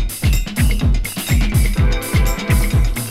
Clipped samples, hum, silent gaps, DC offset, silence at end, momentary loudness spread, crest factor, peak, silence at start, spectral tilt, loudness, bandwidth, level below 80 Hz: under 0.1%; none; none; under 0.1%; 0 s; 3 LU; 12 dB; -4 dBFS; 0 s; -5 dB/octave; -18 LUFS; 16 kHz; -18 dBFS